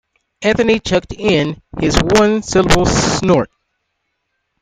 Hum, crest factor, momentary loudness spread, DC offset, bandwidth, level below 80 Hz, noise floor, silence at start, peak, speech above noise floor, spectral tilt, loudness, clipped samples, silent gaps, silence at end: none; 16 dB; 7 LU; under 0.1%; 15.5 kHz; -30 dBFS; -71 dBFS; 0.4 s; 0 dBFS; 57 dB; -4.5 dB/octave; -14 LUFS; under 0.1%; none; 1.15 s